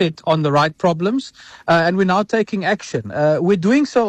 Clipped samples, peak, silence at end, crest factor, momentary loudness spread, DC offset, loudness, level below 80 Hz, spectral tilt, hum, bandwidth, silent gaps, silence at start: under 0.1%; -6 dBFS; 0 s; 12 dB; 8 LU; under 0.1%; -17 LUFS; -58 dBFS; -6.5 dB/octave; none; 9.4 kHz; none; 0 s